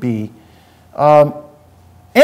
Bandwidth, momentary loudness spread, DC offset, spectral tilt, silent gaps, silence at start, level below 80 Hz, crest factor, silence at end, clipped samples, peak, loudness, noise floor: 15.5 kHz; 22 LU; under 0.1%; -6.5 dB/octave; none; 0 s; -56 dBFS; 14 dB; 0 s; under 0.1%; 0 dBFS; -13 LUFS; -46 dBFS